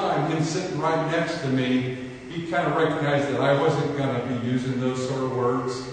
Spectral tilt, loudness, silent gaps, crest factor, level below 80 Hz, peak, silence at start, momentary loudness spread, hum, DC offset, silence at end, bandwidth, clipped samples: -6 dB/octave; -25 LUFS; none; 16 dB; -58 dBFS; -8 dBFS; 0 s; 5 LU; none; under 0.1%; 0 s; 9.6 kHz; under 0.1%